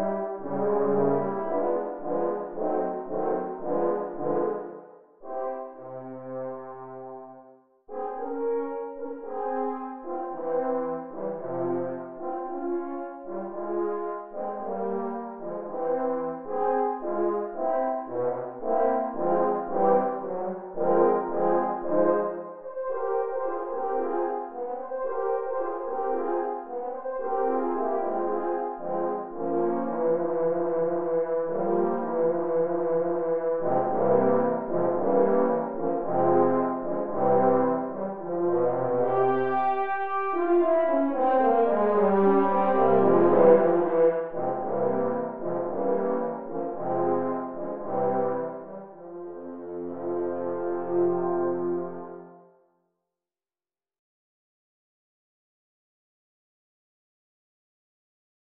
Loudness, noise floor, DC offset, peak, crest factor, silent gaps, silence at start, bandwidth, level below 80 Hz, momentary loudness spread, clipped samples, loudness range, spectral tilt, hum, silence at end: -27 LUFS; under -90 dBFS; 0.8%; -6 dBFS; 20 dB; none; 0 s; 3.7 kHz; -68 dBFS; 13 LU; under 0.1%; 10 LU; -8 dB/octave; none; 4.45 s